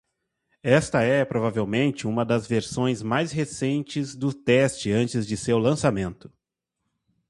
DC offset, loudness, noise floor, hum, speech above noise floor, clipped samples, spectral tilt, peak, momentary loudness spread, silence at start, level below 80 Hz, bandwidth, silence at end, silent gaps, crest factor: under 0.1%; -24 LUFS; -82 dBFS; none; 58 dB; under 0.1%; -6 dB/octave; -4 dBFS; 7 LU; 0.65 s; -54 dBFS; 11.5 kHz; 1.15 s; none; 20 dB